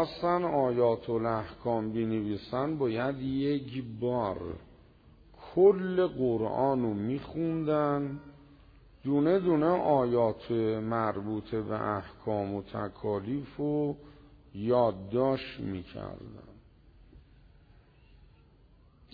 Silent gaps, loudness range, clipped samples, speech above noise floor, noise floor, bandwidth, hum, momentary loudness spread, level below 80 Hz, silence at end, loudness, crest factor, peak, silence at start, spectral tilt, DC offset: none; 5 LU; under 0.1%; 30 dB; -60 dBFS; 5 kHz; none; 12 LU; -58 dBFS; 1.95 s; -30 LUFS; 20 dB; -12 dBFS; 0 s; -7 dB/octave; under 0.1%